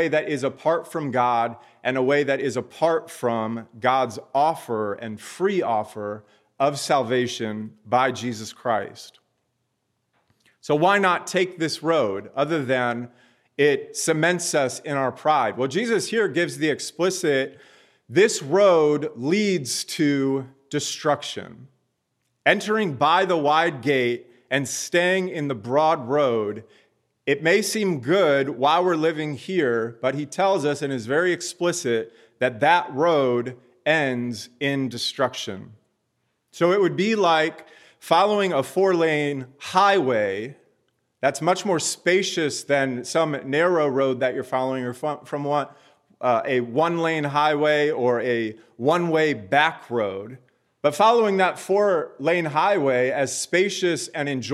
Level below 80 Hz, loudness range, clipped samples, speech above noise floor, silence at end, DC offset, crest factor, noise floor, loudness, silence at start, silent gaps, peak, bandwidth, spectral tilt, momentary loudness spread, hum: -76 dBFS; 4 LU; under 0.1%; 52 dB; 0 s; under 0.1%; 20 dB; -74 dBFS; -22 LUFS; 0 s; none; -2 dBFS; 14.5 kHz; -4.5 dB/octave; 9 LU; none